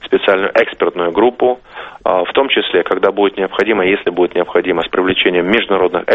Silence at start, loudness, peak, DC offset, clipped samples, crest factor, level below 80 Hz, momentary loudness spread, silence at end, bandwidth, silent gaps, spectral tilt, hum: 0.05 s; -14 LUFS; 0 dBFS; under 0.1%; under 0.1%; 14 dB; -48 dBFS; 4 LU; 0 s; 6.2 kHz; none; -6.5 dB/octave; none